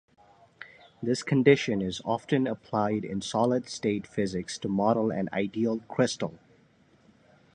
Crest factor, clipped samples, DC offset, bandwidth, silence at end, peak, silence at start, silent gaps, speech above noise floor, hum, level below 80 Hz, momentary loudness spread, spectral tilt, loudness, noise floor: 22 dB; under 0.1%; under 0.1%; 10.5 kHz; 1.2 s; -6 dBFS; 0.6 s; none; 34 dB; none; -62 dBFS; 11 LU; -5.5 dB/octave; -28 LUFS; -62 dBFS